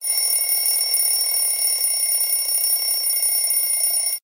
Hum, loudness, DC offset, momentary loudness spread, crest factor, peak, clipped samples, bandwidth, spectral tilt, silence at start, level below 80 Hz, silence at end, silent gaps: none; -17 LUFS; under 0.1%; 1 LU; 14 dB; -6 dBFS; under 0.1%; 17 kHz; 7 dB/octave; 0 s; -88 dBFS; 0.05 s; none